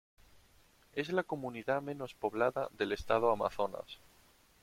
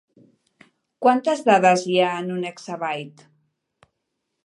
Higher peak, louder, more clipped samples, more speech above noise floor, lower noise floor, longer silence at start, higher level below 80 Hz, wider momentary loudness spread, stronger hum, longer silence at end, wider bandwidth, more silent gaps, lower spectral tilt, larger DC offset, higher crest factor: second, -16 dBFS vs -2 dBFS; second, -35 LUFS vs -21 LUFS; neither; second, 31 dB vs 58 dB; second, -66 dBFS vs -78 dBFS; second, 0.35 s vs 1 s; first, -62 dBFS vs -76 dBFS; about the same, 12 LU vs 14 LU; neither; second, 0.65 s vs 1.35 s; first, 16.5 kHz vs 11 kHz; neither; about the same, -6 dB/octave vs -5 dB/octave; neither; about the same, 22 dB vs 22 dB